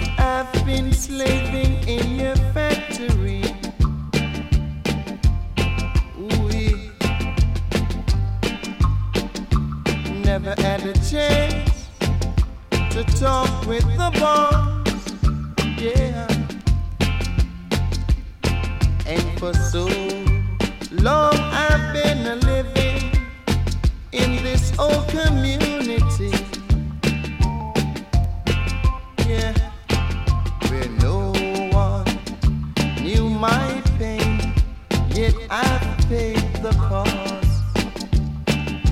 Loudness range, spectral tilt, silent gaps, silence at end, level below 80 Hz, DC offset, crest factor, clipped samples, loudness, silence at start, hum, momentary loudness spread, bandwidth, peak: 3 LU; -6 dB/octave; none; 0 s; -24 dBFS; under 0.1%; 16 dB; under 0.1%; -21 LUFS; 0 s; none; 5 LU; 15.5 kHz; -2 dBFS